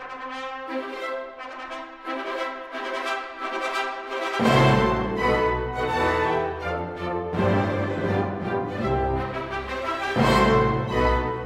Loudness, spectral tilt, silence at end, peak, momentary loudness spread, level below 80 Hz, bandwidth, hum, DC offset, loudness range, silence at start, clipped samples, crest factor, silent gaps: -25 LUFS; -6.5 dB/octave; 0 s; -4 dBFS; 13 LU; -38 dBFS; 15 kHz; none; under 0.1%; 7 LU; 0 s; under 0.1%; 20 dB; none